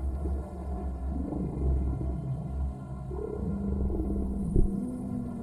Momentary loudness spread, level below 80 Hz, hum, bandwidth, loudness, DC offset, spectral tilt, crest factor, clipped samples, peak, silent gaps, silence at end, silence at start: 7 LU; -32 dBFS; none; 10.5 kHz; -33 LUFS; under 0.1%; -10.5 dB/octave; 20 dB; under 0.1%; -10 dBFS; none; 0 s; 0 s